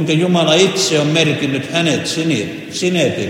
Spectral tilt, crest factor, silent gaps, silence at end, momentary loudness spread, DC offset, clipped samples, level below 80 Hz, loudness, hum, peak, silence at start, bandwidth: -4.5 dB/octave; 16 dB; none; 0 s; 7 LU; under 0.1%; under 0.1%; -58 dBFS; -15 LUFS; none; 0 dBFS; 0 s; 16.5 kHz